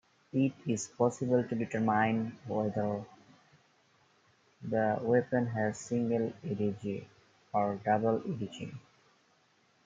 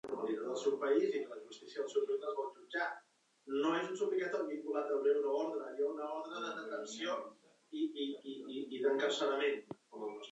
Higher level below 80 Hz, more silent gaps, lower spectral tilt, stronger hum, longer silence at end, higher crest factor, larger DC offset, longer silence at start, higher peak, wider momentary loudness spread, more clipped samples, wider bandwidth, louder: first, -74 dBFS vs under -90 dBFS; neither; first, -6.5 dB/octave vs -3.5 dB/octave; neither; first, 1.05 s vs 0 s; about the same, 20 dB vs 18 dB; neither; first, 0.35 s vs 0.05 s; first, -14 dBFS vs -20 dBFS; about the same, 11 LU vs 12 LU; neither; first, 9.4 kHz vs 8.2 kHz; first, -32 LUFS vs -38 LUFS